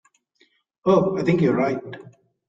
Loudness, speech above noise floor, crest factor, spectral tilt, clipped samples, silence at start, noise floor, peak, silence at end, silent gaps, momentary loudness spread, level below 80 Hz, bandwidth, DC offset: -21 LUFS; 44 dB; 18 dB; -8.5 dB/octave; under 0.1%; 0.85 s; -64 dBFS; -6 dBFS; 0.45 s; none; 17 LU; -60 dBFS; 7.6 kHz; under 0.1%